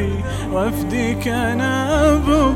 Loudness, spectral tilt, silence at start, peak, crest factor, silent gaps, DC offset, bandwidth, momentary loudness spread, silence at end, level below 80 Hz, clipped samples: -18 LUFS; -6 dB/octave; 0 s; -4 dBFS; 14 dB; none; under 0.1%; 16.5 kHz; 7 LU; 0 s; -28 dBFS; under 0.1%